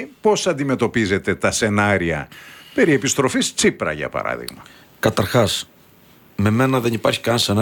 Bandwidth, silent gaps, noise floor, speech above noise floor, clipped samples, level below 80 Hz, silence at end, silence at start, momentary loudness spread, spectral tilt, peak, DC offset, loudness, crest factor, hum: 19 kHz; none; -50 dBFS; 31 dB; under 0.1%; -48 dBFS; 0 s; 0 s; 10 LU; -4.5 dB/octave; -2 dBFS; under 0.1%; -19 LUFS; 18 dB; none